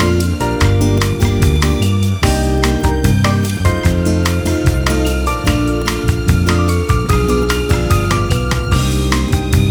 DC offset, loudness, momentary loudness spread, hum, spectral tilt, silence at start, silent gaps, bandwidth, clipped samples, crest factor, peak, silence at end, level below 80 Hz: under 0.1%; -15 LUFS; 2 LU; none; -5.5 dB/octave; 0 s; none; over 20 kHz; under 0.1%; 14 dB; 0 dBFS; 0 s; -20 dBFS